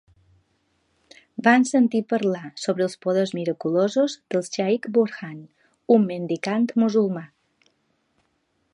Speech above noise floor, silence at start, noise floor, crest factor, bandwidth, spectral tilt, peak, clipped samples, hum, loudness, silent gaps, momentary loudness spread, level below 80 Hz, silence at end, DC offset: 49 dB; 1.4 s; -70 dBFS; 22 dB; 11 kHz; -5.5 dB/octave; -2 dBFS; under 0.1%; none; -22 LUFS; none; 10 LU; -72 dBFS; 1.45 s; under 0.1%